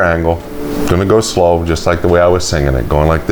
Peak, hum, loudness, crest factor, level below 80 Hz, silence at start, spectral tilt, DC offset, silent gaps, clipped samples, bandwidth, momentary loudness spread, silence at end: 0 dBFS; none; -13 LUFS; 12 dB; -24 dBFS; 0 s; -5.5 dB/octave; under 0.1%; none; under 0.1%; over 20 kHz; 7 LU; 0 s